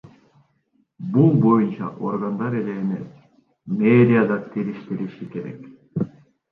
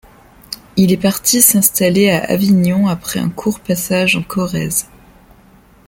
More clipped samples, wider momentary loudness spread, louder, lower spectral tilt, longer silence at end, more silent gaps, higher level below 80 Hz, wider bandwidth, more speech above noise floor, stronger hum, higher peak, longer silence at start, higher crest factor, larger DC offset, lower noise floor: neither; first, 17 LU vs 11 LU; second, -21 LUFS vs -14 LUFS; first, -11 dB/octave vs -4 dB/octave; second, 0.45 s vs 1.05 s; neither; second, -64 dBFS vs -46 dBFS; second, 4.5 kHz vs 17 kHz; first, 46 dB vs 32 dB; neither; second, -4 dBFS vs 0 dBFS; first, 1 s vs 0.5 s; about the same, 18 dB vs 16 dB; neither; first, -66 dBFS vs -46 dBFS